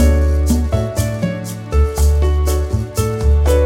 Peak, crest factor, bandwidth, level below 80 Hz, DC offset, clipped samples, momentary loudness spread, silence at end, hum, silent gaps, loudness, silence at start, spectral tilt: -2 dBFS; 12 dB; 16 kHz; -16 dBFS; under 0.1%; under 0.1%; 6 LU; 0 s; none; none; -17 LUFS; 0 s; -6.5 dB/octave